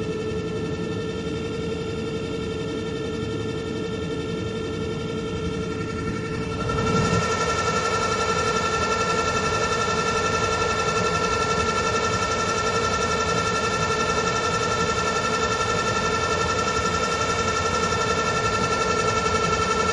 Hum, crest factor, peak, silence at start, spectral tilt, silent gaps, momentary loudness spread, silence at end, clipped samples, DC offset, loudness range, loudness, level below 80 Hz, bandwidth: none; 16 dB; -8 dBFS; 0 s; -4 dB/octave; none; 7 LU; 0 s; under 0.1%; under 0.1%; 6 LU; -23 LUFS; -42 dBFS; 11.5 kHz